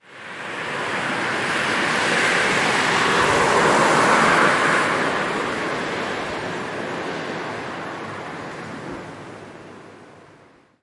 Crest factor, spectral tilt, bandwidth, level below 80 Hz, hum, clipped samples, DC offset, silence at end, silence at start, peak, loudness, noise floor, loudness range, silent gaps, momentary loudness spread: 18 dB; -3 dB/octave; 11.5 kHz; -56 dBFS; none; under 0.1%; under 0.1%; 0.6 s; 0.1 s; -2 dBFS; -20 LUFS; -52 dBFS; 15 LU; none; 17 LU